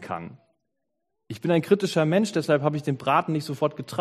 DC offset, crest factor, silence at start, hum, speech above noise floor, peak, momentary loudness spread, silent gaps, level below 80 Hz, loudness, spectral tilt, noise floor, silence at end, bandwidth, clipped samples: under 0.1%; 18 dB; 0 s; none; 56 dB; -6 dBFS; 13 LU; none; -68 dBFS; -24 LUFS; -6.5 dB/octave; -80 dBFS; 0 s; 13.5 kHz; under 0.1%